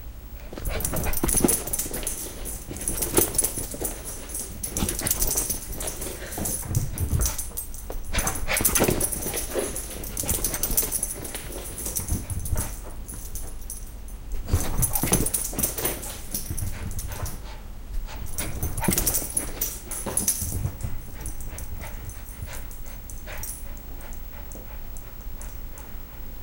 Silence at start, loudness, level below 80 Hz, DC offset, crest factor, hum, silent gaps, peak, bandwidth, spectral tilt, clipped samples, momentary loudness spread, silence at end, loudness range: 0 s; -27 LUFS; -34 dBFS; under 0.1%; 24 dB; none; none; -4 dBFS; 17 kHz; -3.5 dB/octave; under 0.1%; 17 LU; 0 s; 12 LU